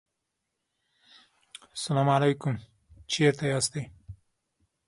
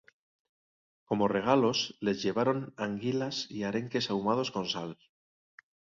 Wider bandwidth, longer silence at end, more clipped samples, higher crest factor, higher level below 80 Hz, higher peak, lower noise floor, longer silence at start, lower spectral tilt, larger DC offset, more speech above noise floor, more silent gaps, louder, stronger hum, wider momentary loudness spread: first, 11.5 kHz vs 7.6 kHz; second, 0.75 s vs 1 s; neither; about the same, 22 dB vs 22 dB; first, -62 dBFS vs -68 dBFS; about the same, -10 dBFS vs -12 dBFS; second, -82 dBFS vs under -90 dBFS; first, 1.75 s vs 1.1 s; about the same, -5 dB/octave vs -5 dB/octave; neither; second, 56 dB vs over 60 dB; neither; first, -27 LUFS vs -31 LUFS; neither; first, 19 LU vs 9 LU